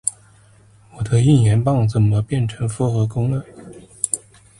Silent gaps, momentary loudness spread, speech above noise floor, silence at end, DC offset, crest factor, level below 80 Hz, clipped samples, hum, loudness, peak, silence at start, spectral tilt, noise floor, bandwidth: none; 11 LU; 33 dB; 0.45 s; under 0.1%; 18 dB; -44 dBFS; under 0.1%; none; -19 LUFS; 0 dBFS; 0.05 s; -6.5 dB/octave; -50 dBFS; 11.5 kHz